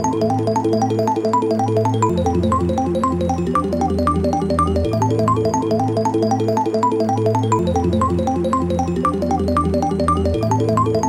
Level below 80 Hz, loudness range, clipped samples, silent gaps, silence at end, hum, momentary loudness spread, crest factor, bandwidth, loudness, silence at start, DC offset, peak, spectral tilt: -34 dBFS; 1 LU; under 0.1%; none; 0 s; none; 2 LU; 14 dB; 14.5 kHz; -18 LUFS; 0 s; under 0.1%; -4 dBFS; -7.5 dB/octave